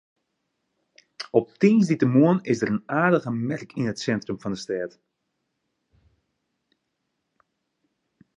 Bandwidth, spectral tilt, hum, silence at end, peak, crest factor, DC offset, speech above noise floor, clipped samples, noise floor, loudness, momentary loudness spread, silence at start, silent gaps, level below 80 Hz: 10 kHz; -7 dB/octave; none; 3.5 s; -4 dBFS; 22 dB; under 0.1%; 56 dB; under 0.1%; -78 dBFS; -23 LUFS; 12 LU; 1.2 s; none; -66 dBFS